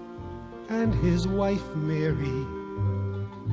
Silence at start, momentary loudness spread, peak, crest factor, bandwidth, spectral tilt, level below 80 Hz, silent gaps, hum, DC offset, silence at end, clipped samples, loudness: 0 s; 14 LU; -14 dBFS; 14 dB; 7.8 kHz; -8 dB/octave; -40 dBFS; none; none; under 0.1%; 0 s; under 0.1%; -28 LUFS